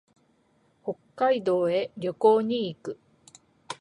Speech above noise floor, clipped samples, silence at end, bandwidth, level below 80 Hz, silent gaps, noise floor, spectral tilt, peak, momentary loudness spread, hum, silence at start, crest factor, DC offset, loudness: 41 dB; under 0.1%; 0.05 s; 11 kHz; -74 dBFS; none; -66 dBFS; -6 dB/octave; -8 dBFS; 18 LU; none; 0.85 s; 20 dB; under 0.1%; -26 LUFS